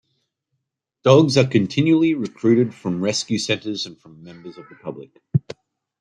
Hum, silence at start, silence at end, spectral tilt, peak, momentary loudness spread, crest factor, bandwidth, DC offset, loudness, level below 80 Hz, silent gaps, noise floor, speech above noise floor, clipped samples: none; 1.05 s; 0.6 s; -6 dB/octave; -2 dBFS; 23 LU; 20 dB; 10.5 kHz; under 0.1%; -19 LUFS; -62 dBFS; none; -77 dBFS; 58 dB; under 0.1%